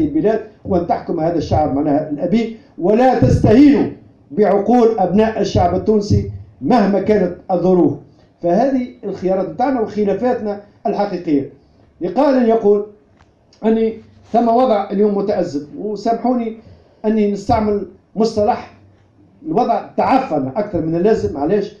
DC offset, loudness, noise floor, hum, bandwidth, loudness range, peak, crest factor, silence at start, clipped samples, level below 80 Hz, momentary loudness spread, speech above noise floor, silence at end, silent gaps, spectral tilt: under 0.1%; -16 LUFS; -51 dBFS; none; 7.6 kHz; 5 LU; 0 dBFS; 16 dB; 0 s; under 0.1%; -40 dBFS; 10 LU; 36 dB; 0.1 s; none; -8 dB/octave